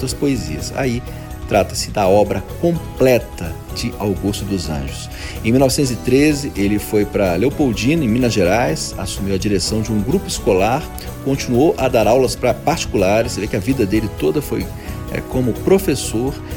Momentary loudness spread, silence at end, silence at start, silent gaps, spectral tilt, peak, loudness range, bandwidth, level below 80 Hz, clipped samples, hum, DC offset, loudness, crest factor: 10 LU; 0 s; 0 s; none; -5.5 dB/octave; 0 dBFS; 3 LU; 19 kHz; -32 dBFS; under 0.1%; none; under 0.1%; -17 LUFS; 16 dB